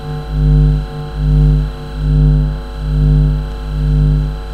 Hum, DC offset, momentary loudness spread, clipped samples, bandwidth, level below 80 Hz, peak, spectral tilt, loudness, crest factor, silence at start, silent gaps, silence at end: none; under 0.1%; 9 LU; under 0.1%; 4.8 kHz; -14 dBFS; 0 dBFS; -9 dB/octave; -15 LUFS; 12 dB; 0 s; none; 0 s